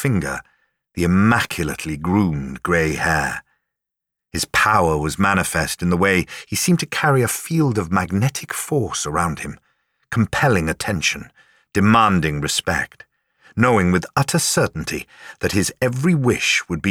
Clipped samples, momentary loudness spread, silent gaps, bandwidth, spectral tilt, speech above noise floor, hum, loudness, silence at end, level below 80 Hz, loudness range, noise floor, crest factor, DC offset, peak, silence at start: under 0.1%; 10 LU; none; 18 kHz; -4.5 dB/octave; 65 dB; none; -19 LUFS; 0 s; -42 dBFS; 3 LU; -83 dBFS; 16 dB; under 0.1%; -4 dBFS; 0 s